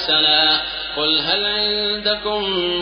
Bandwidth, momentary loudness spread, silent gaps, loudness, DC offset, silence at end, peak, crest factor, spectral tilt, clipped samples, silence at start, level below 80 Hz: 6.4 kHz; 8 LU; none; -17 LUFS; under 0.1%; 0 s; -4 dBFS; 16 dB; 0.5 dB/octave; under 0.1%; 0 s; -46 dBFS